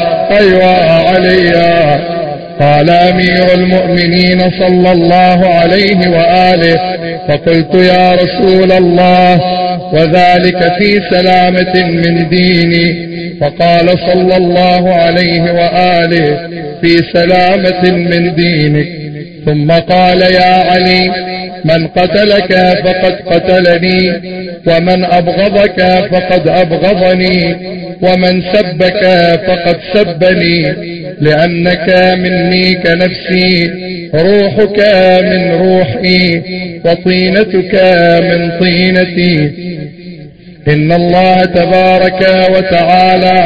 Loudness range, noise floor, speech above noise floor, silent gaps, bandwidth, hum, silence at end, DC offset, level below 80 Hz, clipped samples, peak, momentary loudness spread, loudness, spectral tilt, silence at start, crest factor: 2 LU; -31 dBFS; 23 dB; none; 8 kHz; none; 0 s; 2%; -36 dBFS; 0.7%; 0 dBFS; 7 LU; -8 LUFS; -8 dB/octave; 0 s; 8 dB